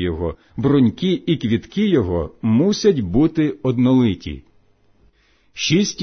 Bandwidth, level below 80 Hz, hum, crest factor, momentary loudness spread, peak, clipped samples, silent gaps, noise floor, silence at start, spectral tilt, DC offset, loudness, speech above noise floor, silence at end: 6.6 kHz; -40 dBFS; none; 14 dB; 11 LU; -4 dBFS; under 0.1%; none; -57 dBFS; 0 s; -6 dB/octave; under 0.1%; -18 LUFS; 39 dB; 0 s